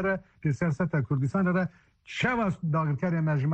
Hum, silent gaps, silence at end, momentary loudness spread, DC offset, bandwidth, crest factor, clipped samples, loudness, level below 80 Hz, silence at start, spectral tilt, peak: none; none; 0 s; 5 LU; under 0.1%; 8.2 kHz; 12 dB; under 0.1%; -28 LUFS; -56 dBFS; 0 s; -8 dB/octave; -14 dBFS